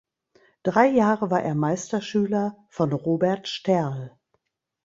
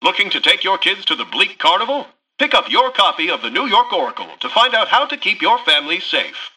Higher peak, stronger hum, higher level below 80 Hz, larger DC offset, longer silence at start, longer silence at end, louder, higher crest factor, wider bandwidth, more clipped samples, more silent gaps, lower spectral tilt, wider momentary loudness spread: second, -4 dBFS vs 0 dBFS; neither; about the same, -64 dBFS vs -64 dBFS; neither; first, 0.65 s vs 0 s; first, 0.75 s vs 0.1 s; second, -24 LUFS vs -15 LUFS; about the same, 20 dB vs 16 dB; second, 7.8 kHz vs 11.5 kHz; neither; neither; first, -6.5 dB/octave vs -1.5 dB/octave; first, 11 LU vs 7 LU